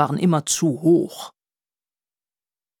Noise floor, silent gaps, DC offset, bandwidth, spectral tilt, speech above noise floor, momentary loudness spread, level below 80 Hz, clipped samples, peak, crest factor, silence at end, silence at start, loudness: under -90 dBFS; none; under 0.1%; 18.5 kHz; -5.5 dB/octave; over 71 dB; 17 LU; -70 dBFS; under 0.1%; -4 dBFS; 20 dB; 1.5 s; 0 s; -19 LUFS